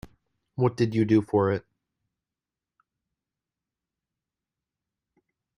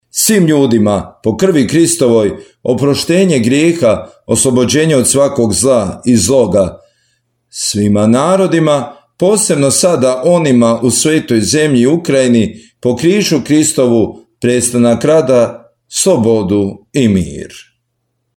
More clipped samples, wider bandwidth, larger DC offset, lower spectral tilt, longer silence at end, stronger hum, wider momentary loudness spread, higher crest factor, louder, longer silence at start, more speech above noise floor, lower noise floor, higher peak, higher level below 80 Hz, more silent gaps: neither; second, 10.5 kHz vs 17.5 kHz; neither; first, -8.5 dB/octave vs -4.5 dB/octave; first, 4 s vs 0.8 s; neither; about the same, 9 LU vs 8 LU; first, 20 dB vs 12 dB; second, -25 LUFS vs -11 LUFS; first, 0.6 s vs 0.15 s; first, 67 dB vs 56 dB; first, -90 dBFS vs -67 dBFS; second, -10 dBFS vs 0 dBFS; second, -64 dBFS vs -44 dBFS; neither